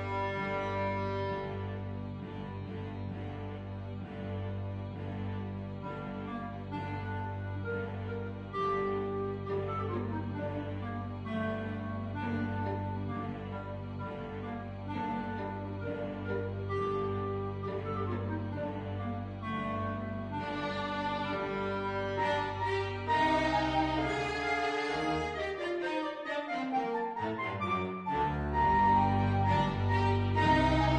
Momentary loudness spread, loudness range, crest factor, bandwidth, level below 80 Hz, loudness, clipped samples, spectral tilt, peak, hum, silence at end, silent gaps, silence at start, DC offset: 11 LU; 9 LU; 18 dB; 9.2 kHz; -50 dBFS; -34 LUFS; under 0.1%; -7 dB/octave; -16 dBFS; none; 0 s; none; 0 s; under 0.1%